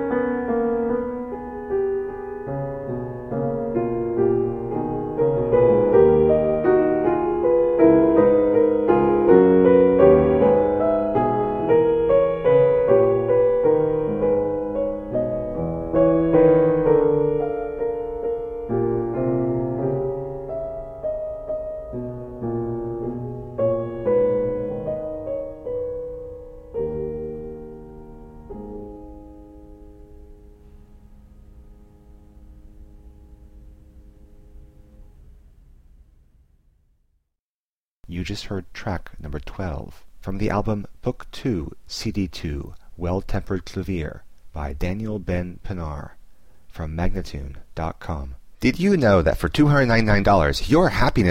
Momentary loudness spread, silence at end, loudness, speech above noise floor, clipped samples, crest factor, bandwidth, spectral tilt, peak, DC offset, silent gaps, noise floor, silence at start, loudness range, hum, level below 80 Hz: 17 LU; 0 s; -21 LUFS; over 69 dB; under 0.1%; 20 dB; 11 kHz; -7.5 dB/octave; -2 dBFS; under 0.1%; 37.40-38.03 s; under -90 dBFS; 0 s; 16 LU; none; -38 dBFS